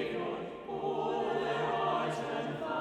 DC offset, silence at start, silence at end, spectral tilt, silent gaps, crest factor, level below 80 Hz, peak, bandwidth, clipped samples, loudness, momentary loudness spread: under 0.1%; 0 s; 0 s; -6 dB/octave; none; 14 dB; -68 dBFS; -20 dBFS; 12 kHz; under 0.1%; -34 LUFS; 6 LU